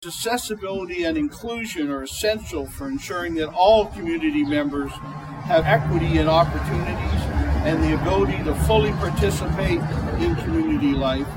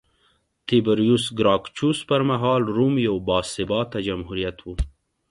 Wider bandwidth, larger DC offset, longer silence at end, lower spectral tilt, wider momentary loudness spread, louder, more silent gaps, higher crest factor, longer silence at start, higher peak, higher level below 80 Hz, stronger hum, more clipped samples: first, 16.5 kHz vs 11.5 kHz; neither; second, 0 s vs 0.4 s; about the same, -6 dB/octave vs -6 dB/octave; about the same, 10 LU vs 11 LU; about the same, -22 LUFS vs -22 LUFS; neither; about the same, 18 dB vs 16 dB; second, 0 s vs 0.7 s; about the same, -4 dBFS vs -6 dBFS; first, -30 dBFS vs -40 dBFS; neither; neither